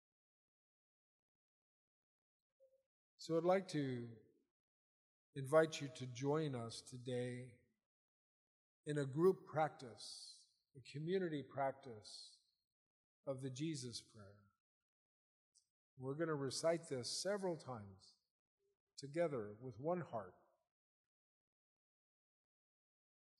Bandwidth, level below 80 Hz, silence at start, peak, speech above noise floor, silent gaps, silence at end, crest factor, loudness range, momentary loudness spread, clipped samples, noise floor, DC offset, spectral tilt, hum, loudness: 12 kHz; -90 dBFS; 3.2 s; -20 dBFS; over 47 dB; 4.51-5.33 s, 7.86-8.84 s, 12.64-13.23 s, 14.60-15.52 s, 15.70-15.97 s, 18.31-18.58 s, 18.80-18.87 s; 3.1 s; 26 dB; 9 LU; 18 LU; under 0.1%; under -90 dBFS; under 0.1%; -5.5 dB/octave; none; -43 LUFS